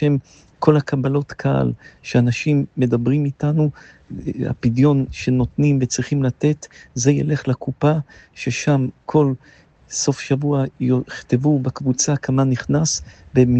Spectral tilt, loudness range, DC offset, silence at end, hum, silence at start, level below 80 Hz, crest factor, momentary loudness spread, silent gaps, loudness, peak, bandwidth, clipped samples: -6 dB/octave; 2 LU; under 0.1%; 0 s; none; 0 s; -46 dBFS; 18 dB; 8 LU; none; -19 LUFS; 0 dBFS; 8.6 kHz; under 0.1%